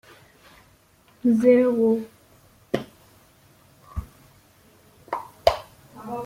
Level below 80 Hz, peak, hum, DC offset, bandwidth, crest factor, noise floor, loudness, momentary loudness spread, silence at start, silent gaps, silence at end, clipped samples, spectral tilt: -50 dBFS; -2 dBFS; none; under 0.1%; 16 kHz; 24 dB; -57 dBFS; -23 LUFS; 21 LU; 1.25 s; none; 0 s; under 0.1%; -6.5 dB/octave